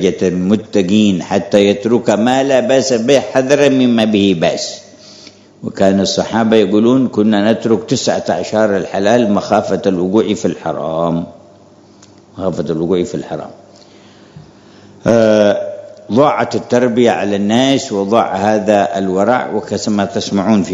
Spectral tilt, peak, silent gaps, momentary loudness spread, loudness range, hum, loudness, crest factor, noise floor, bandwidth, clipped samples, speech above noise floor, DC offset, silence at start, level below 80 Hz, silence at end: -5.5 dB/octave; 0 dBFS; none; 9 LU; 7 LU; none; -13 LUFS; 14 dB; -43 dBFS; 8.6 kHz; 0.2%; 30 dB; under 0.1%; 0 s; -56 dBFS; 0 s